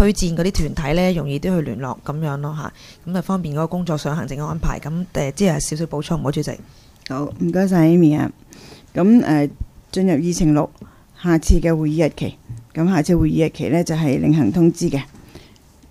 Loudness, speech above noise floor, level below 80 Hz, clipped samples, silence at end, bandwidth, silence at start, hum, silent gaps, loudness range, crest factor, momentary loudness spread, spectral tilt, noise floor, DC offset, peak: -19 LUFS; 29 dB; -32 dBFS; under 0.1%; 0.5 s; 15 kHz; 0 s; none; none; 6 LU; 18 dB; 13 LU; -6.5 dB/octave; -47 dBFS; under 0.1%; 0 dBFS